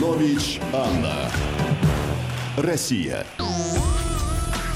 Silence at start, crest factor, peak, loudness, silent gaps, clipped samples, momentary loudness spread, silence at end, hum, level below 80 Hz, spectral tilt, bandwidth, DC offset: 0 s; 14 dB; -8 dBFS; -24 LUFS; none; under 0.1%; 5 LU; 0 s; none; -30 dBFS; -5 dB/octave; 16 kHz; under 0.1%